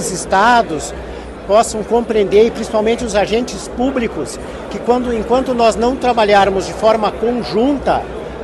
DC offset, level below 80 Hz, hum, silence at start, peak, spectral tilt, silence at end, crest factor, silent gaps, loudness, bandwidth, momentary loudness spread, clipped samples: under 0.1%; -36 dBFS; none; 0 s; 0 dBFS; -4.5 dB/octave; 0 s; 14 dB; none; -15 LUFS; 12.5 kHz; 13 LU; under 0.1%